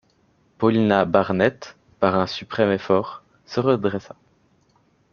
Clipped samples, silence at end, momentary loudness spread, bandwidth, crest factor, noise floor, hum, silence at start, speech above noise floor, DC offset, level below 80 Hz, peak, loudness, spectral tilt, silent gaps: under 0.1%; 1.1 s; 15 LU; 7 kHz; 20 dB; -62 dBFS; none; 0.6 s; 41 dB; under 0.1%; -60 dBFS; -2 dBFS; -21 LUFS; -7 dB/octave; none